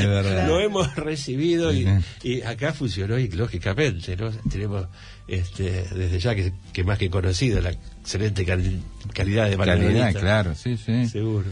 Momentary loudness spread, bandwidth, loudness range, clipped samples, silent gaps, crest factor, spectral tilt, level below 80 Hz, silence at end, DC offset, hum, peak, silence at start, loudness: 9 LU; 10.5 kHz; 4 LU; under 0.1%; none; 14 dB; -6 dB/octave; -38 dBFS; 0 s; under 0.1%; none; -8 dBFS; 0 s; -24 LUFS